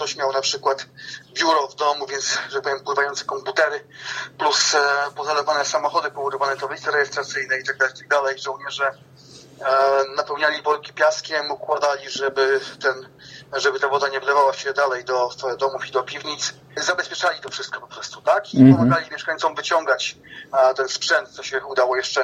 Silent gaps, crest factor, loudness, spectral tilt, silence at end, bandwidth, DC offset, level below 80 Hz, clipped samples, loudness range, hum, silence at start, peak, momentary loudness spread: none; 20 dB; -21 LUFS; -3.5 dB/octave; 0 s; 10 kHz; under 0.1%; -64 dBFS; under 0.1%; 4 LU; none; 0 s; 0 dBFS; 10 LU